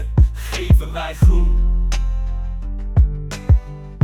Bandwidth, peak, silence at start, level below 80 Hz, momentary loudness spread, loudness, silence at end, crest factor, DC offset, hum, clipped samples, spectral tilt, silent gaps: 13 kHz; -2 dBFS; 0 s; -18 dBFS; 11 LU; -19 LUFS; 0 s; 14 dB; under 0.1%; none; under 0.1%; -6.5 dB/octave; none